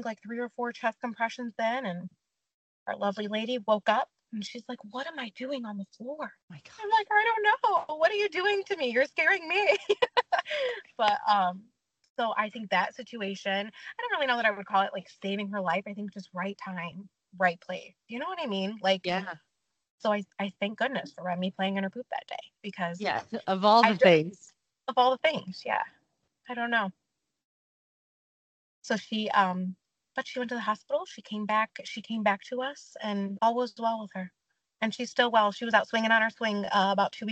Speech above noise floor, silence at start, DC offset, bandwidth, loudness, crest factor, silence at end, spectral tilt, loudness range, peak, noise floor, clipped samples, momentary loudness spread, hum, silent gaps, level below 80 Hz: 45 dB; 0 s; under 0.1%; 8.6 kHz; -29 LUFS; 24 dB; 0 s; -5 dB/octave; 8 LU; -6 dBFS; -74 dBFS; under 0.1%; 15 LU; none; 2.54-2.86 s, 6.43-6.48 s, 12.10-12.15 s, 19.90-19.98 s, 27.45-28.82 s; -80 dBFS